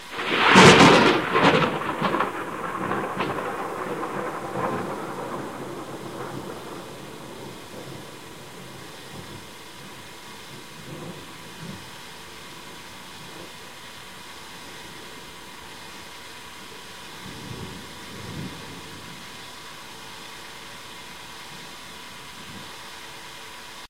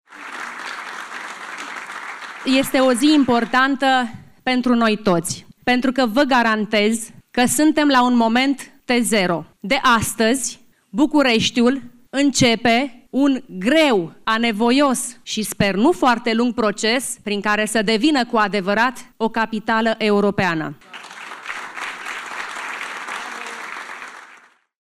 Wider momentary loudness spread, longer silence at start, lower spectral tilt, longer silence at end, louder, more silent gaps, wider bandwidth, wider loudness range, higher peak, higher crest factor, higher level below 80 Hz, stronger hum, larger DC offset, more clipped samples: first, 20 LU vs 15 LU; about the same, 0 s vs 0.1 s; about the same, -4 dB/octave vs -3.5 dB/octave; second, 0.05 s vs 0.55 s; second, -21 LUFS vs -18 LUFS; neither; about the same, 16 kHz vs 15 kHz; first, 15 LU vs 5 LU; first, 0 dBFS vs -6 dBFS; first, 26 dB vs 14 dB; about the same, -54 dBFS vs -54 dBFS; neither; first, 0.3% vs under 0.1%; neither